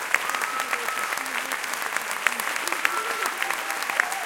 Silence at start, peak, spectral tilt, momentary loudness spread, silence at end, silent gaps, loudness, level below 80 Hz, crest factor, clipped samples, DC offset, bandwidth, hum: 0 s; 0 dBFS; 1 dB/octave; 3 LU; 0 s; none; -25 LUFS; -72 dBFS; 26 dB; under 0.1%; under 0.1%; 17 kHz; none